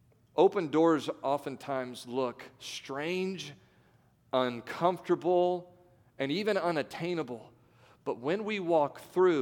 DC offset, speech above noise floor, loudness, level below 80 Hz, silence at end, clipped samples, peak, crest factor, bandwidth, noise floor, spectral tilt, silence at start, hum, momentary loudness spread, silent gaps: under 0.1%; 35 dB; -31 LUFS; -76 dBFS; 0 s; under 0.1%; -12 dBFS; 20 dB; 17 kHz; -65 dBFS; -6 dB/octave; 0.35 s; none; 13 LU; none